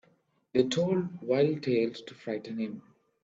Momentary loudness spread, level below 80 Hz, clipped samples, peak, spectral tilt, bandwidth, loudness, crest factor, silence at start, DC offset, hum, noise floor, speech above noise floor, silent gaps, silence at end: 11 LU; -70 dBFS; under 0.1%; -10 dBFS; -6.5 dB/octave; 8 kHz; -30 LUFS; 20 dB; 0.55 s; under 0.1%; none; -69 dBFS; 40 dB; none; 0.45 s